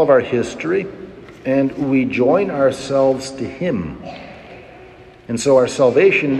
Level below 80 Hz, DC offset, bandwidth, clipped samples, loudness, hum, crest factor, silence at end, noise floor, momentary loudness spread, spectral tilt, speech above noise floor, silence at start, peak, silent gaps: -50 dBFS; under 0.1%; 12 kHz; under 0.1%; -17 LUFS; none; 16 dB; 0 s; -41 dBFS; 21 LU; -5.5 dB/octave; 25 dB; 0 s; -2 dBFS; none